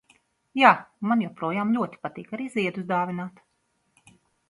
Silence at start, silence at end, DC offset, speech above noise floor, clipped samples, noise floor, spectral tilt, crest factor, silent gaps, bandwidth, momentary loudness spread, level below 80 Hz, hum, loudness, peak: 0.55 s; 1.2 s; under 0.1%; 47 dB; under 0.1%; -72 dBFS; -6.5 dB/octave; 24 dB; none; 11.5 kHz; 16 LU; -72 dBFS; none; -25 LUFS; -2 dBFS